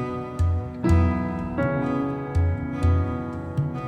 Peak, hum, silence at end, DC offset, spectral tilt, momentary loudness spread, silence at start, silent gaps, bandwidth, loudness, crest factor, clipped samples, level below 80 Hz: -8 dBFS; none; 0 s; under 0.1%; -9 dB/octave; 7 LU; 0 s; none; 9 kHz; -25 LUFS; 16 dB; under 0.1%; -38 dBFS